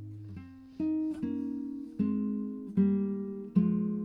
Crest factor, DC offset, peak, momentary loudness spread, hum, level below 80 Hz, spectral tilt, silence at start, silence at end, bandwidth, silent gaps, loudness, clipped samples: 18 dB; under 0.1%; -14 dBFS; 17 LU; none; -68 dBFS; -11.5 dB/octave; 0 s; 0 s; 3.4 kHz; none; -32 LUFS; under 0.1%